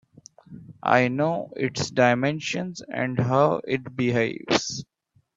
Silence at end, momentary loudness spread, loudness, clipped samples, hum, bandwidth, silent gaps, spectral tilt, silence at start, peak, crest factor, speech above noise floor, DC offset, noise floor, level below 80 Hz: 0.55 s; 10 LU; -24 LUFS; under 0.1%; none; 7.8 kHz; none; -5 dB/octave; 0.5 s; -2 dBFS; 22 dB; 26 dB; under 0.1%; -50 dBFS; -62 dBFS